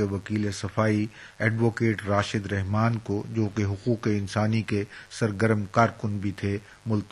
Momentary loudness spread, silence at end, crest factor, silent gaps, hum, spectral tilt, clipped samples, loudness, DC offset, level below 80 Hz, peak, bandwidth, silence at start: 6 LU; 0.05 s; 20 dB; none; none; -7 dB/octave; under 0.1%; -27 LUFS; under 0.1%; -58 dBFS; -6 dBFS; 11.5 kHz; 0 s